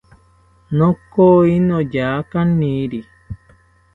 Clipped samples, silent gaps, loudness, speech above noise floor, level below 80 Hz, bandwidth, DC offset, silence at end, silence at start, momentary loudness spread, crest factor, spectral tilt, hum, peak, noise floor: under 0.1%; none; -16 LUFS; 38 dB; -44 dBFS; 4.2 kHz; under 0.1%; 0.6 s; 0.7 s; 24 LU; 16 dB; -10 dB/octave; none; 0 dBFS; -52 dBFS